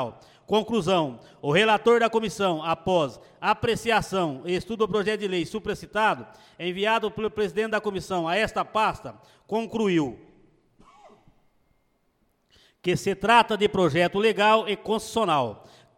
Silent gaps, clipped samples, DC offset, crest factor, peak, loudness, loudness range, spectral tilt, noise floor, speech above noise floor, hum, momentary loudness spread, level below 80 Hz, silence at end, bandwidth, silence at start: none; under 0.1%; under 0.1%; 20 dB; -6 dBFS; -24 LUFS; 9 LU; -5 dB/octave; -69 dBFS; 44 dB; none; 11 LU; -56 dBFS; 0.45 s; 16 kHz; 0 s